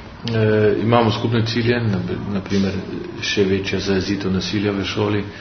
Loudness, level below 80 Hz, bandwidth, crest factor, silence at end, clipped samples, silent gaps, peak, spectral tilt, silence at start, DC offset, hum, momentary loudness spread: -20 LUFS; -46 dBFS; 6.6 kHz; 18 dB; 0 s; under 0.1%; none; 0 dBFS; -6 dB/octave; 0 s; under 0.1%; none; 8 LU